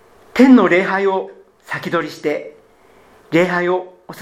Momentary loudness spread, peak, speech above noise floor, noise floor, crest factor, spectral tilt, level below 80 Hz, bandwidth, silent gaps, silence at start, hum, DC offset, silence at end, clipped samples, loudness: 16 LU; 0 dBFS; 35 dB; -49 dBFS; 16 dB; -6.5 dB/octave; -60 dBFS; 13.5 kHz; none; 0.35 s; none; under 0.1%; 0 s; under 0.1%; -16 LUFS